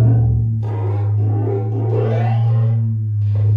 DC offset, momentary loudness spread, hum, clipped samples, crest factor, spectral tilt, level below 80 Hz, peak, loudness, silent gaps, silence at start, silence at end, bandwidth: under 0.1%; 4 LU; none; under 0.1%; 12 dB; -11 dB/octave; -34 dBFS; -4 dBFS; -18 LUFS; none; 0 s; 0 s; 3.3 kHz